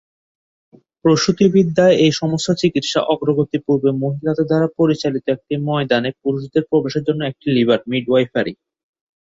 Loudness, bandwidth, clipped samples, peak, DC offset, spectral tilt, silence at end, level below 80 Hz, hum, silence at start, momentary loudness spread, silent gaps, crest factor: -17 LUFS; 8 kHz; under 0.1%; -2 dBFS; under 0.1%; -6 dB/octave; 0.7 s; -56 dBFS; none; 1.05 s; 8 LU; none; 16 dB